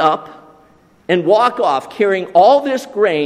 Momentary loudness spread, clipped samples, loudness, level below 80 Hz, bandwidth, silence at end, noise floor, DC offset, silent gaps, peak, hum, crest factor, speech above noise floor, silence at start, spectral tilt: 8 LU; under 0.1%; -14 LUFS; -64 dBFS; 13.5 kHz; 0 s; -49 dBFS; under 0.1%; none; 0 dBFS; none; 14 dB; 36 dB; 0 s; -5.5 dB/octave